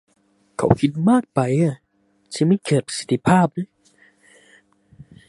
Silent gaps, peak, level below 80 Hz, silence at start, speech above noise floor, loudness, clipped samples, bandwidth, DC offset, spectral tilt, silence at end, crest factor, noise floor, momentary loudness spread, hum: none; 0 dBFS; -50 dBFS; 0.6 s; 44 dB; -20 LUFS; under 0.1%; 11.5 kHz; under 0.1%; -6.5 dB/octave; 1.65 s; 20 dB; -62 dBFS; 16 LU; none